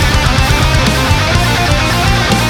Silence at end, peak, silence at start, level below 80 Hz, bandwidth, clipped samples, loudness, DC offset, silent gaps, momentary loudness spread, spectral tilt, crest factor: 0 s; 0 dBFS; 0 s; -18 dBFS; 18 kHz; under 0.1%; -11 LUFS; under 0.1%; none; 1 LU; -4.5 dB/octave; 10 dB